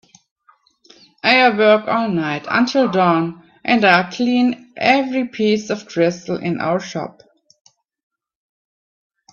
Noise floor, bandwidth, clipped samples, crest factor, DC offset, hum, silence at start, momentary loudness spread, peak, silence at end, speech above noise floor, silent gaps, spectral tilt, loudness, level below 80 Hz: -57 dBFS; 7.2 kHz; under 0.1%; 18 dB; under 0.1%; none; 1.25 s; 11 LU; 0 dBFS; 2.2 s; 40 dB; none; -5.5 dB/octave; -17 LUFS; -64 dBFS